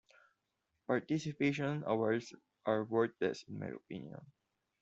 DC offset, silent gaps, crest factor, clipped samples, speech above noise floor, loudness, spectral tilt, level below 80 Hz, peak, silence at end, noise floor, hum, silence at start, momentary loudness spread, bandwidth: under 0.1%; none; 20 dB; under 0.1%; 48 dB; -37 LUFS; -5.5 dB/octave; -78 dBFS; -18 dBFS; 0.55 s; -85 dBFS; none; 0.9 s; 15 LU; 8 kHz